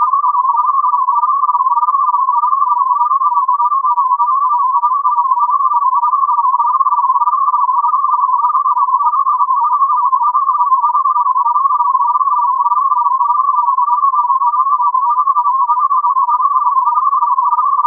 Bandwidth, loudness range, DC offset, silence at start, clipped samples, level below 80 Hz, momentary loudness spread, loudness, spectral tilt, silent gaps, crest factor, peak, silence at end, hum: 1.4 kHz; 0 LU; under 0.1%; 0 s; under 0.1%; under -90 dBFS; 1 LU; -12 LUFS; -2 dB/octave; none; 10 dB; -2 dBFS; 0 s; none